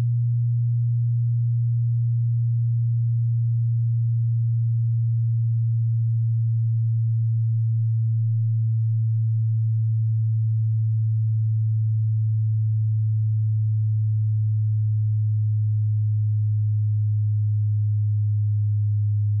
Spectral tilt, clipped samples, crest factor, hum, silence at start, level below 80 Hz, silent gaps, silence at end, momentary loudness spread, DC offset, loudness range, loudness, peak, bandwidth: -30 dB/octave; under 0.1%; 4 dB; none; 0 s; -64 dBFS; none; 0 s; 0 LU; under 0.1%; 0 LU; -23 LUFS; -18 dBFS; 0.2 kHz